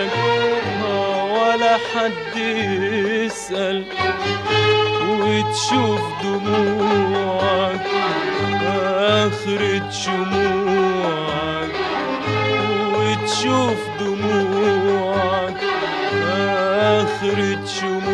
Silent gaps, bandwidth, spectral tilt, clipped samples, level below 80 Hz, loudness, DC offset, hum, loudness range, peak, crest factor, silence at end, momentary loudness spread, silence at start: none; 11.5 kHz; -4.5 dB/octave; under 0.1%; -52 dBFS; -19 LUFS; under 0.1%; none; 1 LU; -4 dBFS; 16 dB; 0 s; 5 LU; 0 s